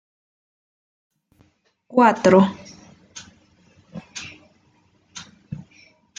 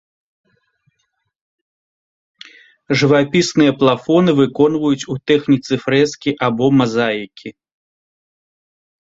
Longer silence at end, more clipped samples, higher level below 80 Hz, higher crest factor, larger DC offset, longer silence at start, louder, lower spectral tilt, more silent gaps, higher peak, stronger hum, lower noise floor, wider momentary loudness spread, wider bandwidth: second, 0.65 s vs 1.6 s; neither; second, -62 dBFS vs -56 dBFS; about the same, 22 dB vs 18 dB; neither; second, 1.95 s vs 2.9 s; about the same, -17 LUFS vs -15 LUFS; about the same, -6 dB/octave vs -6 dB/octave; neither; about the same, -2 dBFS vs 0 dBFS; neither; second, -61 dBFS vs -70 dBFS; first, 26 LU vs 7 LU; about the same, 7.8 kHz vs 7.8 kHz